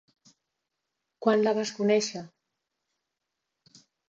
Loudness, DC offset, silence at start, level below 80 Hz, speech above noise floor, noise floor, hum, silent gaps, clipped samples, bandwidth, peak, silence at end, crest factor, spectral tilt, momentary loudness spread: -26 LUFS; under 0.1%; 1.2 s; -80 dBFS; 59 dB; -84 dBFS; none; none; under 0.1%; 7.8 kHz; -10 dBFS; 1.8 s; 22 dB; -4.5 dB/octave; 9 LU